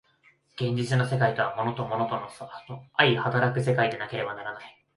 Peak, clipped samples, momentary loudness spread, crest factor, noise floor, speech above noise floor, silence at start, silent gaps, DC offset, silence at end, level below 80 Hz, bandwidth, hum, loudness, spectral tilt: -4 dBFS; under 0.1%; 17 LU; 22 dB; -63 dBFS; 36 dB; 0.55 s; none; under 0.1%; 0.25 s; -64 dBFS; 11.5 kHz; none; -26 LUFS; -6 dB/octave